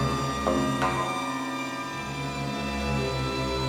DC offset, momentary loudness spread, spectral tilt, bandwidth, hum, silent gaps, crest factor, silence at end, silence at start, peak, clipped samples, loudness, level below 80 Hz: under 0.1%; 6 LU; -5 dB/octave; 19 kHz; none; none; 16 dB; 0 s; 0 s; -12 dBFS; under 0.1%; -28 LUFS; -42 dBFS